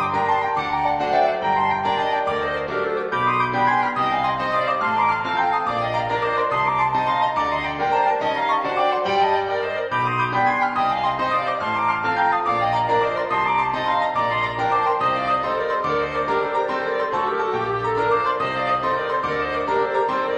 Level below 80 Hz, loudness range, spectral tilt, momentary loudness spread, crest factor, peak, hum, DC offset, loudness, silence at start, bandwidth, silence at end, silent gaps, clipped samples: -52 dBFS; 1 LU; -5.5 dB/octave; 3 LU; 14 dB; -8 dBFS; none; under 0.1%; -21 LUFS; 0 s; 10 kHz; 0 s; none; under 0.1%